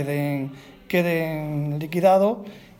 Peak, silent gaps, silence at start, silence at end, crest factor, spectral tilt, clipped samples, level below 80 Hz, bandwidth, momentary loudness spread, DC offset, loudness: -6 dBFS; none; 0 s; 0.2 s; 18 dB; -7.5 dB/octave; under 0.1%; -58 dBFS; 18.5 kHz; 11 LU; under 0.1%; -23 LUFS